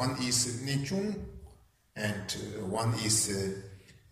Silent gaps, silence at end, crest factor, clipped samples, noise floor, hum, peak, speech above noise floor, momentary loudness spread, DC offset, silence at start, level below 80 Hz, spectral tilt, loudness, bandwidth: none; 0.2 s; 20 dB; under 0.1%; -60 dBFS; none; -14 dBFS; 28 dB; 16 LU; under 0.1%; 0 s; -56 dBFS; -3.5 dB/octave; -31 LUFS; 15.5 kHz